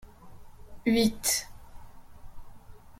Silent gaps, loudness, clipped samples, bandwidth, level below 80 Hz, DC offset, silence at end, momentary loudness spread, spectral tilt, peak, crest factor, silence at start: none; -27 LUFS; under 0.1%; 16.5 kHz; -50 dBFS; under 0.1%; 0.05 s; 10 LU; -3 dB/octave; -14 dBFS; 20 dB; 0.05 s